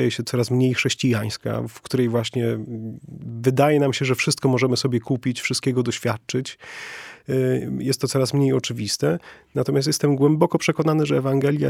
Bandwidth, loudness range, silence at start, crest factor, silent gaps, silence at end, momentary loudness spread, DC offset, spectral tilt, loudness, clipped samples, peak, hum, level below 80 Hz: 16 kHz; 3 LU; 0 s; 20 dB; none; 0 s; 11 LU; under 0.1%; -5.5 dB/octave; -22 LUFS; under 0.1%; -2 dBFS; none; -60 dBFS